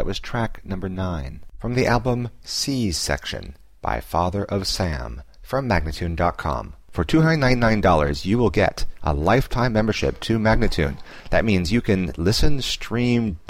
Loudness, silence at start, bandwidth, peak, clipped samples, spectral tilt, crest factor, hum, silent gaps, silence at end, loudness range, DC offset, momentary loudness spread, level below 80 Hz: -22 LUFS; 0 s; 16 kHz; -6 dBFS; under 0.1%; -5.5 dB/octave; 16 dB; none; none; 0.15 s; 5 LU; under 0.1%; 12 LU; -30 dBFS